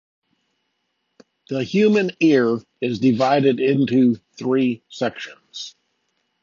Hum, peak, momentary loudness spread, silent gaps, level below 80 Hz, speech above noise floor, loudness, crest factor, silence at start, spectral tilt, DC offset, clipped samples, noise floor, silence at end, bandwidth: none; -4 dBFS; 17 LU; none; -64 dBFS; 55 dB; -19 LUFS; 16 dB; 1.5 s; -6.5 dB/octave; under 0.1%; under 0.1%; -73 dBFS; 0.75 s; 7.4 kHz